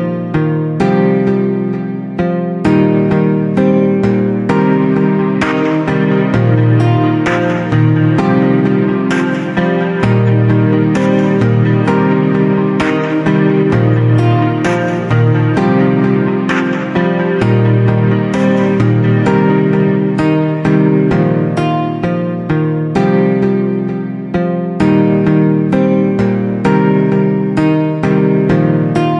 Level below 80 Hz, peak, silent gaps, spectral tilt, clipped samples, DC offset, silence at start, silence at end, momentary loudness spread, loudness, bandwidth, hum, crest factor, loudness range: -42 dBFS; 0 dBFS; none; -8.5 dB/octave; under 0.1%; under 0.1%; 0 s; 0 s; 4 LU; -12 LUFS; 8 kHz; none; 10 dB; 2 LU